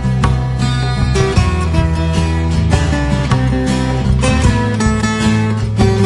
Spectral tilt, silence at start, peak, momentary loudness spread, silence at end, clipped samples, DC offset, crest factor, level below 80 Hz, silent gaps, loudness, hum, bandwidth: -6 dB/octave; 0 s; 0 dBFS; 2 LU; 0 s; under 0.1%; under 0.1%; 12 dB; -20 dBFS; none; -14 LUFS; none; 11.5 kHz